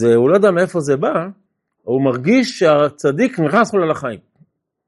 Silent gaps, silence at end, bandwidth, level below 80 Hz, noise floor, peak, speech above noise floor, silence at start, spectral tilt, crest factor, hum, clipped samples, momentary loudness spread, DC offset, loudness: none; 0.7 s; 11.5 kHz; -62 dBFS; -56 dBFS; -2 dBFS; 42 dB; 0 s; -6.5 dB/octave; 14 dB; none; under 0.1%; 11 LU; under 0.1%; -15 LUFS